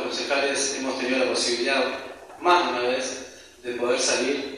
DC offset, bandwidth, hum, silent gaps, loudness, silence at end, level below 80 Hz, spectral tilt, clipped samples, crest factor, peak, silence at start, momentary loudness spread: under 0.1%; 13.5 kHz; none; none; -23 LUFS; 0 s; -64 dBFS; -1 dB/octave; under 0.1%; 18 dB; -6 dBFS; 0 s; 14 LU